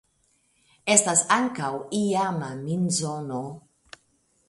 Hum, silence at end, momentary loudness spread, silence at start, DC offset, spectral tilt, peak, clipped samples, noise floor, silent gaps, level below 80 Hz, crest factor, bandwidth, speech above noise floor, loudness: none; 0.9 s; 14 LU; 0.85 s; under 0.1%; -3.5 dB/octave; -4 dBFS; under 0.1%; -67 dBFS; none; -66 dBFS; 22 dB; 11.5 kHz; 43 dB; -24 LUFS